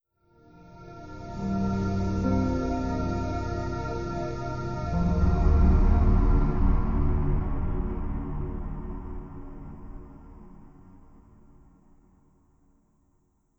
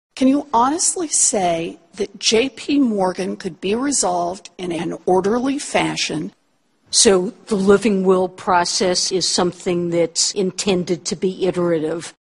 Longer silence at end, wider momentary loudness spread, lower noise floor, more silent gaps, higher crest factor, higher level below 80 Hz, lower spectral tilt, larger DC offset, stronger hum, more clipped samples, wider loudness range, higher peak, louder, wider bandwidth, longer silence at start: first, 2.6 s vs 0.2 s; first, 21 LU vs 10 LU; first, -68 dBFS vs -64 dBFS; neither; about the same, 16 dB vs 18 dB; first, -30 dBFS vs -52 dBFS; first, -9 dB/octave vs -3.5 dB/octave; neither; neither; neither; first, 16 LU vs 4 LU; second, -10 dBFS vs 0 dBFS; second, -28 LUFS vs -18 LUFS; second, 7 kHz vs 11.5 kHz; first, 0.65 s vs 0.15 s